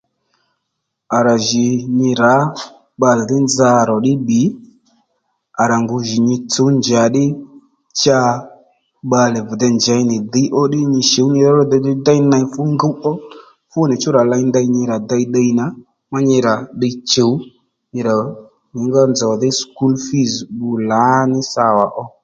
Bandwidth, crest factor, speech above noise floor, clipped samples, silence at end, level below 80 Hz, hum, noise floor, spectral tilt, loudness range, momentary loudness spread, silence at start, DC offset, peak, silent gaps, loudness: 8.8 kHz; 16 dB; 60 dB; under 0.1%; 0.15 s; -56 dBFS; none; -74 dBFS; -5 dB/octave; 3 LU; 9 LU; 1.1 s; under 0.1%; 0 dBFS; none; -15 LUFS